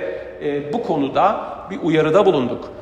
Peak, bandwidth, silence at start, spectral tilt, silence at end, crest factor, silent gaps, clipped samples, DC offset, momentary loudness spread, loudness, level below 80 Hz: -2 dBFS; 8.8 kHz; 0 s; -7 dB/octave; 0 s; 18 dB; none; under 0.1%; under 0.1%; 12 LU; -19 LUFS; -52 dBFS